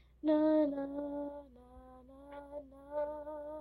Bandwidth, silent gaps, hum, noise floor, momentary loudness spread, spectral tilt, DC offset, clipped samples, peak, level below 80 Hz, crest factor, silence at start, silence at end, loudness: 4.5 kHz; none; none; -56 dBFS; 26 LU; -8.5 dB/octave; under 0.1%; under 0.1%; -22 dBFS; -64 dBFS; 16 dB; 0.25 s; 0 s; -35 LUFS